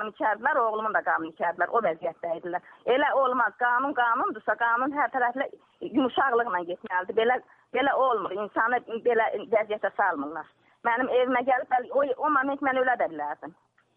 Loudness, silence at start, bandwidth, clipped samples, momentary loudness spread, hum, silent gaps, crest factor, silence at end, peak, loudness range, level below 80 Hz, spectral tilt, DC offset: -26 LUFS; 0 s; 4.7 kHz; under 0.1%; 9 LU; none; none; 18 dB; 0.45 s; -10 dBFS; 1 LU; -72 dBFS; -7 dB/octave; under 0.1%